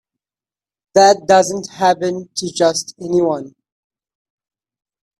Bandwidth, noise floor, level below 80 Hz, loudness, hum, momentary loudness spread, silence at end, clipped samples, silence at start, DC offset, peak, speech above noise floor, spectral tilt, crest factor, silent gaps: 13.5 kHz; under -90 dBFS; -60 dBFS; -16 LUFS; none; 12 LU; 1.7 s; under 0.1%; 0.95 s; under 0.1%; 0 dBFS; over 75 dB; -3.5 dB/octave; 18 dB; none